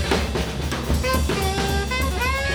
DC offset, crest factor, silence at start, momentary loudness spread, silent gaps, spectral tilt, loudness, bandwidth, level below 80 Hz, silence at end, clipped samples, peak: under 0.1%; 16 dB; 0 s; 4 LU; none; -4.5 dB/octave; -23 LUFS; over 20 kHz; -26 dBFS; 0 s; under 0.1%; -6 dBFS